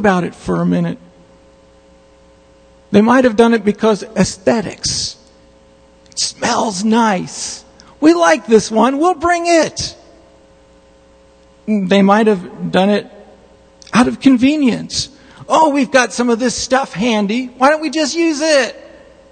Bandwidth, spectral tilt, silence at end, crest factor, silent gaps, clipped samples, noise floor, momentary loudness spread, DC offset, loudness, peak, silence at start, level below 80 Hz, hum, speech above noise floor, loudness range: 9.4 kHz; -4.5 dB/octave; 0.5 s; 16 dB; none; under 0.1%; -47 dBFS; 9 LU; under 0.1%; -14 LUFS; 0 dBFS; 0 s; -46 dBFS; none; 33 dB; 4 LU